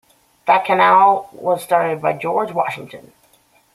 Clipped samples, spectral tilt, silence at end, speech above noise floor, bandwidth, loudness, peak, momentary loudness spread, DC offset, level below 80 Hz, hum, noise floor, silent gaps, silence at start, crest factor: under 0.1%; -5 dB/octave; 0.75 s; 39 dB; 14.5 kHz; -16 LUFS; -2 dBFS; 13 LU; under 0.1%; -66 dBFS; none; -56 dBFS; none; 0.45 s; 16 dB